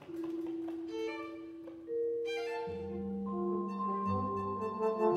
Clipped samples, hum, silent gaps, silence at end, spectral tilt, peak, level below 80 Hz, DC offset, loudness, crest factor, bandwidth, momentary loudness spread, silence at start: under 0.1%; none; none; 0 s; -7.5 dB/octave; -18 dBFS; -70 dBFS; under 0.1%; -37 LUFS; 18 dB; 9.4 kHz; 7 LU; 0 s